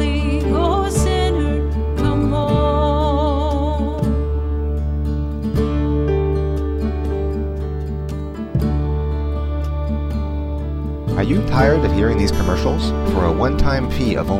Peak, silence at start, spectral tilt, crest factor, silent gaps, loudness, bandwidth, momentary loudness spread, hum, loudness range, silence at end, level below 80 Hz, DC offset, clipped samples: -2 dBFS; 0 s; -7 dB/octave; 16 dB; none; -19 LUFS; 12.5 kHz; 7 LU; none; 5 LU; 0 s; -22 dBFS; under 0.1%; under 0.1%